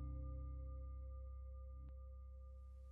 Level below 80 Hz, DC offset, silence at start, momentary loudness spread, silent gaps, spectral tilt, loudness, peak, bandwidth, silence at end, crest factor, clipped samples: -52 dBFS; under 0.1%; 0 s; 8 LU; none; -12 dB/octave; -54 LUFS; -40 dBFS; 2.2 kHz; 0 s; 10 dB; under 0.1%